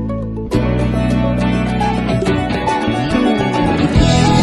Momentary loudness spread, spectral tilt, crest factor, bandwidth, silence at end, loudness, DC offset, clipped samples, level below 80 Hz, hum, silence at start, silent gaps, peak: 5 LU; -6.5 dB/octave; 14 dB; 12 kHz; 0 s; -15 LUFS; under 0.1%; under 0.1%; -24 dBFS; none; 0 s; none; -2 dBFS